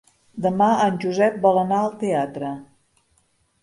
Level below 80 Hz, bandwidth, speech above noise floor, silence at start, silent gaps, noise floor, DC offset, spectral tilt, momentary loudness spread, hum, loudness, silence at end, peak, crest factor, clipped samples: -64 dBFS; 11.5 kHz; 45 dB; 0.35 s; none; -65 dBFS; under 0.1%; -6.5 dB/octave; 13 LU; none; -21 LUFS; 1 s; -4 dBFS; 18 dB; under 0.1%